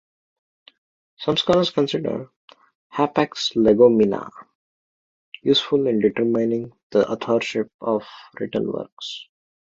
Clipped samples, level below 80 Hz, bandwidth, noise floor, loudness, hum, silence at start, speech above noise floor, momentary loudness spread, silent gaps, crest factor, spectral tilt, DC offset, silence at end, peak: under 0.1%; -58 dBFS; 7.8 kHz; under -90 dBFS; -21 LUFS; none; 1.2 s; over 70 dB; 15 LU; 2.36-2.48 s, 2.75-2.90 s, 4.55-5.32 s, 6.83-6.90 s, 7.74-7.79 s, 8.92-8.97 s; 20 dB; -5.5 dB/octave; under 0.1%; 0.45 s; -2 dBFS